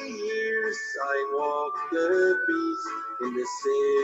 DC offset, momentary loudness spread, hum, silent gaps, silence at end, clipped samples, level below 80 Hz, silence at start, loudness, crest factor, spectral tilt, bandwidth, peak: under 0.1%; 8 LU; none; none; 0 s; under 0.1%; -78 dBFS; 0 s; -27 LUFS; 14 dB; -3 dB/octave; 8.2 kHz; -14 dBFS